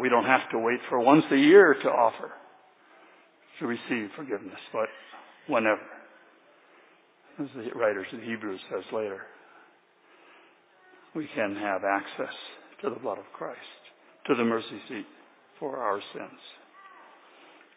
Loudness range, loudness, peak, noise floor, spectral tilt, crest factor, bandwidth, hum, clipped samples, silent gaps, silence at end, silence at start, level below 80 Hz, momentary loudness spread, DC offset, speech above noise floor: 13 LU; -27 LUFS; -4 dBFS; -61 dBFS; -3.5 dB/octave; 24 dB; 4 kHz; none; under 0.1%; none; 1.25 s; 0 s; -80 dBFS; 22 LU; under 0.1%; 34 dB